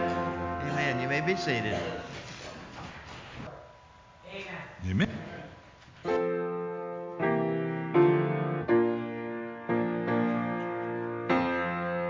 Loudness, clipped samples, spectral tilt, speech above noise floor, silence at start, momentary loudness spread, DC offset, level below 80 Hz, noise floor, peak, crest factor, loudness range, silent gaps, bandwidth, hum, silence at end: -30 LUFS; under 0.1%; -7 dB/octave; 24 dB; 0 s; 17 LU; under 0.1%; -54 dBFS; -54 dBFS; -12 dBFS; 18 dB; 9 LU; none; 7.6 kHz; none; 0 s